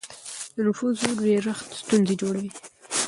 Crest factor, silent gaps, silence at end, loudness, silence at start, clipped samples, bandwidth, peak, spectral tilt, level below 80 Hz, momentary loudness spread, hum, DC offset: 24 dB; none; 0 s; -25 LUFS; 0.05 s; under 0.1%; 11.5 kHz; -2 dBFS; -4.5 dB/octave; -66 dBFS; 14 LU; none; under 0.1%